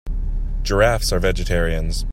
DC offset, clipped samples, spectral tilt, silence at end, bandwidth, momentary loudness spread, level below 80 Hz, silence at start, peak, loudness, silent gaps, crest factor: under 0.1%; under 0.1%; -4.5 dB/octave; 0 s; 16 kHz; 11 LU; -22 dBFS; 0.05 s; -2 dBFS; -21 LUFS; none; 16 dB